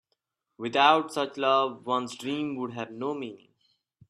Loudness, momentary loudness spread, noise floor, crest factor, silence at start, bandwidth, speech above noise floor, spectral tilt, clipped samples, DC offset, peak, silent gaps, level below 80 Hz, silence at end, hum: -27 LUFS; 14 LU; -79 dBFS; 22 dB; 0.6 s; 13 kHz; 52 dB; -4.5 dB/octave; under 0.1%; under 0.1%; -6 dBFS; none; -78 dBFS; 0.75 s; none